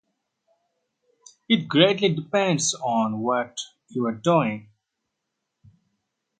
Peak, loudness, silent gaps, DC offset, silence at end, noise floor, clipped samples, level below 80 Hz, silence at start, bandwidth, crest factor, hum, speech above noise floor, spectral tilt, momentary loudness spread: -2 dBFS; -23 LUFS; none; under 0.1%; 1.8 s; -81 dBFS; under 0.1%; -70 dBFS; 1.5 s; 9.4 kHz; 24 dB; none; 58 dB; -4 dB/octave; 13 LU